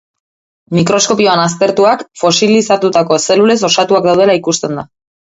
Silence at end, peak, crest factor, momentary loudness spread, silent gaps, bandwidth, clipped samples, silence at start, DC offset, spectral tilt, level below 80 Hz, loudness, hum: 0.4 s; 0 dBFS; 12 dB; 6 LU; none; 8 kHz; under 0.1%; 0.7 s; under 0.1%; -4 dB/octave; -52 dBFS; -11 LUFS; none